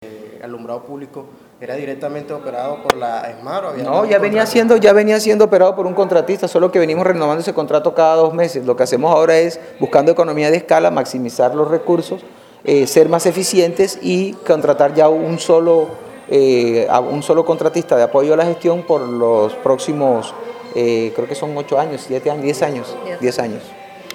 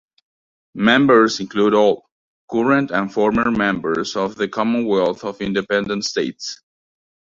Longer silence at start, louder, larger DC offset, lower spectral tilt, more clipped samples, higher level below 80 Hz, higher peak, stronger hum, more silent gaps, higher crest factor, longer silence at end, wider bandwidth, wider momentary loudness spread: second, 0 s vs 0.75 s; first, -15 LUFS vs -18 LUFS; neither; about the same, -5 dB/octave vs -5 dB/octave; neither; second, -62 dBFS vs -54 dBFS; about the same, 0 dBFS vs -2 dBFS; neither; second, none vs 2.12-2.48 s; about the same, 14 dB vs 18 dB; second, 0 s vs 0.85 s; first, 16.5 kHz vs 7.6 kHz; first, 14 LU vs 11 LU